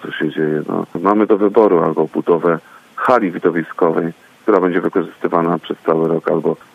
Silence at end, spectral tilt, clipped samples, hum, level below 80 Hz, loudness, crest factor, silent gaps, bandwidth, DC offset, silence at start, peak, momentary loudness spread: 0.2 s; -8.5 dB/octave; under 0.1%; none; -62 dBFS; -16 LUFS; 16 dB; none; 7.8 kHz; under 0.1%; 0 s; 0 dBFS; 8 LU